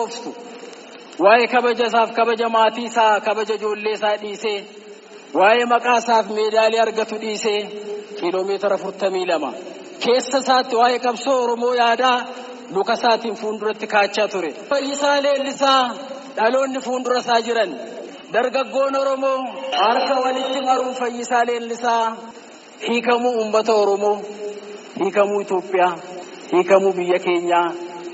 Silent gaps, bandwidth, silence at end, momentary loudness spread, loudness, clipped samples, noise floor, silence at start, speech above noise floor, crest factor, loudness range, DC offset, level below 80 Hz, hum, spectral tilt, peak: none; 8 kHz; 0 s; 15 LU; -19 LUFS; under 0.1%; -40 dBFS; 0 s; 21 dB; 18 dB; 3 LU; under 0.1%; -74 dBFS; none; -1 dB/octave; -2 dBFS